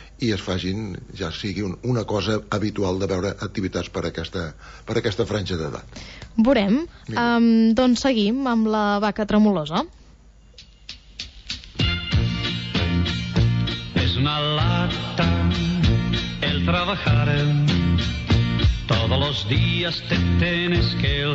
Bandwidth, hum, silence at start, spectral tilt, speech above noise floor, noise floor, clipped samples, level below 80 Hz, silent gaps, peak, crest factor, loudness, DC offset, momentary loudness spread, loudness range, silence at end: 8 kHz; none; 0 s; -6.5 dB/octave; 28 dB; -49 dBFS; under 0.1%; -34 dBFS; none; -8 dBFS; 14 dB; -22 LUFS; under 0.1%; 12 LU; 6 LU; 0 s